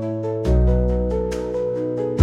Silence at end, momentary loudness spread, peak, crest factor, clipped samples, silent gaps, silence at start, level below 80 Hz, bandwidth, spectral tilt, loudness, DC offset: 0 s; 6 LU; -2 dBFS; 18 dB; under 0.1%; none; 0 s; -24 dBFS; 8.2 kHz; -9 dB/octave; -22 LUFS; under 0.1%